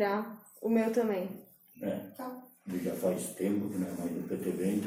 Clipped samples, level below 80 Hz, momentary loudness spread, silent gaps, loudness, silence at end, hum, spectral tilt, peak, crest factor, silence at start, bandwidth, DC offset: under 0.1%; -74 dBFS; 13 LU; none; -34 LUFS; 0 s; none; -6.5 dB/octave; -16 dBFS; 16 dB; 0 s; 16 kHz; under 0.1%